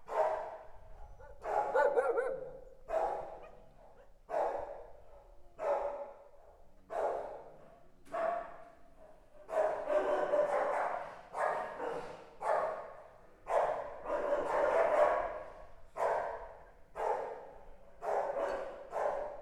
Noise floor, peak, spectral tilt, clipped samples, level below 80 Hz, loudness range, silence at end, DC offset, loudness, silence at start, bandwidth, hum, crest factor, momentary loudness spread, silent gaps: -57 dBFS; -16 dBFS; -4.5 dB/octave; under 0.1%; -60 dBFS; 7 LU; 0 s; under 0.1%; -36 LUFS; 0 s; 12 kHz; none; 20 dB; 21 LU; none